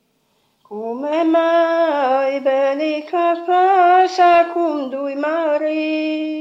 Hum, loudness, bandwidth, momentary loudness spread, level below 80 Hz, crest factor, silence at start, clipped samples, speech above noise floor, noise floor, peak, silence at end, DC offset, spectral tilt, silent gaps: none; -16 LUFS; 7.6 kHz; 10 LU; -72 dBFS; 14 dB; 0.7 s; under 0.1%; 47 dB; -63 dBFS; -2 dBFS; 0 s; under 0.1%; -4 dB/octave; none